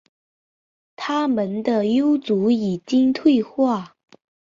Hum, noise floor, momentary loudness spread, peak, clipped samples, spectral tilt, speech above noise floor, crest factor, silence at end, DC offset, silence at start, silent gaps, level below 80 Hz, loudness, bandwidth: none; under -90 dBFS; 5 LU; -6 dBFS; under 0.1%; -7 dB/octave; over 71 dB; 16 dB; 0.65 s; under 0.1%; 1 s; none; -64 dBFS; -20 LUFS; 7.6 kHz